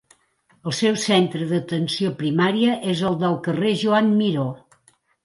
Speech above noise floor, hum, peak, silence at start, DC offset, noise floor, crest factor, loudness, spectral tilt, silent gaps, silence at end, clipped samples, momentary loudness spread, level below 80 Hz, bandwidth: 41 dB; none; -4 dBFS; 0.65 s; under 0.1%; -62 dBFS; 16 dB; -21 LUFS; -5.5 dB/octave; none; 0.65 s; under 0.1%; 8 LU; -64 dBFS; 11.5 kHz